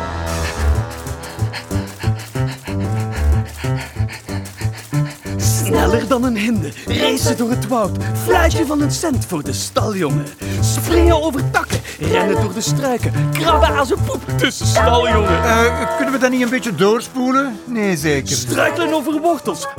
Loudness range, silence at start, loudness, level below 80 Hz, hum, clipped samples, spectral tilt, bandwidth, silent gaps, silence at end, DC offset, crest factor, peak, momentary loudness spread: 6 LU; 0 s; -17 LUFS; -28 dBFS; none; under 0.1%; -5 dB/octave; 18.5 kHz; none; 0 s; under 0.1%; 16 dB; 0 dBFS; 9 LU